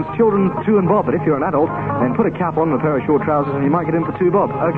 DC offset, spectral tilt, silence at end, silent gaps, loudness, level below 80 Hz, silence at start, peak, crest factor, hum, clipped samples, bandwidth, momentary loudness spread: under 0.1%; -11 dB/octave; 0 s; none; -17 LUFS; -46 dBFS; 0 s; -2 dBFS; 14 dB; none; under 0.1%; 4.3 kHz; 3 LU